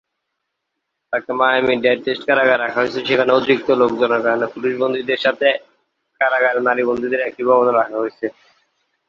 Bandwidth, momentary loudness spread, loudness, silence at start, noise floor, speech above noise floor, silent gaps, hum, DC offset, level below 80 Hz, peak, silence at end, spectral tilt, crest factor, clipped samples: 7 kHz; 8 LU; -17 LUFS; 1.1 s; -76 dBFS; 60 dB; none; none; under 0.1%; -60 dBFS; 0 dBFS; 0.75 s; -6 dB/octave; 18 dB; under 0.1%